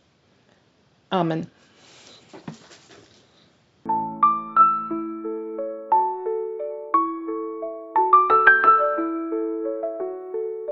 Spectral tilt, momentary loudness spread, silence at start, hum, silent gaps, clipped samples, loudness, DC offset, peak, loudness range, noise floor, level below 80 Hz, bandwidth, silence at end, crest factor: -6.5 dB/octave; 16 LU; 1.1 s; none; none; under 0.1%; -21 LUFS; under 0.1%; 0 dBFS; 13 LU; -61 dBFS; -74 dBFS; 7.8 kHz; 0 s; 22 dB